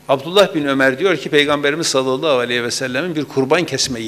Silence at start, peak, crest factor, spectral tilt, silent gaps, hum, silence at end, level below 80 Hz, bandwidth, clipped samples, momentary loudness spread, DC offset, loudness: 0.1 s; -2 dBFS; 16 dB; -3.5 dB/octave; none; none; 0 s; -56 dBFS; 15.5 kHz; under 0.1%; 6 LU; under 0.1%; -16 LUFS